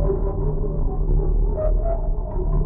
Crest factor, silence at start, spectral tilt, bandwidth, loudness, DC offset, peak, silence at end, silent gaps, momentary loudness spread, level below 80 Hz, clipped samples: 10 dB; 0 s; -14 dB/octave; 1.8 kHz; -25 LUFS; under 0.1%; -10 dBFS; 0 s; none; 4 LU; -20 dBFS; under 0.1%